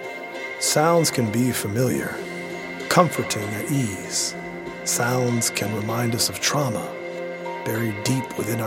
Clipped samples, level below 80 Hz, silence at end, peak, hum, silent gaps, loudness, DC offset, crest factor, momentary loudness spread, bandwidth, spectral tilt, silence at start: under 0.1%; -58 dBFS; 0 s; 0 dBFS; none; none; -23 LUFS; under 0.1%; 24 dB; 12 LU; 17 kHz; -4 dB/octave; 0 s